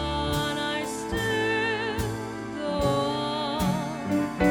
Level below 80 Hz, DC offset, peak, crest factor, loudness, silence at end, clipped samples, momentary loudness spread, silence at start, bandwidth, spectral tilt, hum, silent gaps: -42 dBFS; under 0.1%; -10 dBFS; 18 dB; -27 LUFS; 0 s; under 0.1%; 5 LU; 0 s; over 20 kHz; -5 dB/octave; none; none